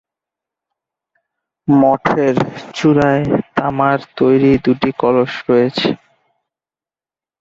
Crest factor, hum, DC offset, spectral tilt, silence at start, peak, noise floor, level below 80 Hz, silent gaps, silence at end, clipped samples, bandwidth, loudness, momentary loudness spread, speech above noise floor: 16 dB; none; under 0.1%; -7.5 dB/octave; 1.65 s; 0 dBFS; under -90 dBFS; -48 dBFS; none; 1.45 s; under 0.1%; 7.6 kHz; -14 LUFS; 7 LU; over 77 dB